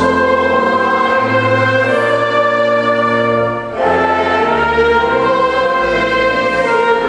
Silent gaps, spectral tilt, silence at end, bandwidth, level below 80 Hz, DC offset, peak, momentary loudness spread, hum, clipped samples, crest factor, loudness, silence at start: none; -5.5 dB/octave; 0 s; 10.5 kHz; -40 dBFS; under 0.1%; 0 dBFS; 2 LU; none; under 0.1%; 12 dB; -13 LUFS; 0 s